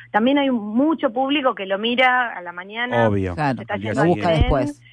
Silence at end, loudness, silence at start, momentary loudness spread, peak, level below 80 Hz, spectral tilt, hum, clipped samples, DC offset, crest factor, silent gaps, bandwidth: 0.2 s; -20 LUFS; 0 s; 8 LU; -4 dBFS; -34 dBFS; -7 dB/octave; none; under 0.1%; under 0.1%; 16 dB; none; 10.5 kHz